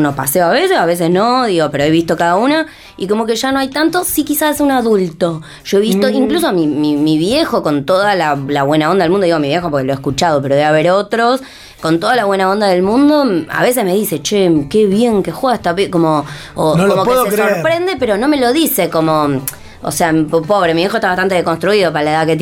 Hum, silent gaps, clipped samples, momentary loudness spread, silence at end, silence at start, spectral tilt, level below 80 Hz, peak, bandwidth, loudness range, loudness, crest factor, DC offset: none; none; under 0.1%; 5 LU; 0 s; 0 s; -5 dB/octave; -44 dBFS; -2 dBFS; 18 kHz; 1 LU; -13 LUFS; 10 dB; under 0.1%